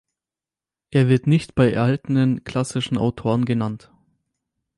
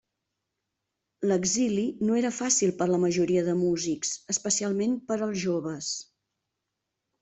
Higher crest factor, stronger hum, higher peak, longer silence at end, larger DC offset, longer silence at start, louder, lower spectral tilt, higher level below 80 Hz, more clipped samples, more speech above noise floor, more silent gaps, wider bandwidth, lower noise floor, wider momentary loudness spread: about the same, 16 dB vs 16 dB; neither; first, -4 dBFS vs -12 dBFS; second, 1 s vs 1.2 s; neither; second, 0.9 s vs 1.2 s; first, -21 LUFS vs -27 LUFS; first, -7 dB/octave vs -4 dB/octave; first, -50 dBFS vs -66 dBFS; neither; first, over 71 dB vs 57 dB; neither; first, 11.5 kHz vs 8.4 kHz; first, under -90 dBFS vs -84 dBFS; about the same, 7 LU vs 7 LU